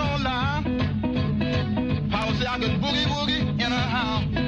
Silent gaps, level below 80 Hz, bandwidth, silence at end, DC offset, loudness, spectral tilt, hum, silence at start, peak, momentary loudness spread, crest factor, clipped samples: none; -38 dBFS; 7.8 kHz; 0 s; under 0.1%; -24 LUFS; -6 dB/octave; none; 0 s; -12 dBFS; 2 LU; 12 dB; under 0.1%